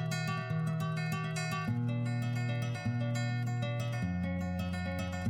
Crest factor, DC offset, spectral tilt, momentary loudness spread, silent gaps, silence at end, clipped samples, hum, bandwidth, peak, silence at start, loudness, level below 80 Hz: 12 dB; under 0.1%; -6.5 dB/octave; 2 LU; none; 0 s; under 0.1%; none; 16 kHz; -22 dBFS; 0 s; -35 LUFS; -58 dBFS